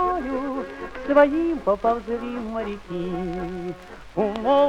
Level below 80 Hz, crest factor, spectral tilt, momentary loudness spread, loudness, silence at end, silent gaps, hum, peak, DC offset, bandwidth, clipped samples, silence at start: -46 dBFS; 18 dB; -7 dB/octave; 15 LU; -24 LUFS; 0 s; none; none; -4 dBFS; under 0.1%; 8.8 kHz; under 0.1%; 0 s